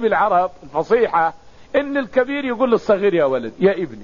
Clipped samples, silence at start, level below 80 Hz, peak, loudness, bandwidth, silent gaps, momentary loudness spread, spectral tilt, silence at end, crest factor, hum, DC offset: under 0.1%; 0 s; -52 dBFS; -4 dBFS; -18 LUFS; 7.2 kHz; none; 6 LU; -4.5 dB/octave; 0 s; 14 dB; none; 0.6%